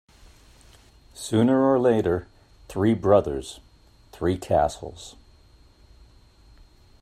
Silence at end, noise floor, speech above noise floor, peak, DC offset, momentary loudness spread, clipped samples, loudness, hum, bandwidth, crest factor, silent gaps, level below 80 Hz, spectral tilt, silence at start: 1.9 s; -54 dBFS; 32 dB; -6 dBFS; under 0.1%; 20 LU; under 0.1%; -23 LUFS; none; 14.5 kHz; 20 dB; none; -50 dBFS; -6.5 dB/octave; 1.15 s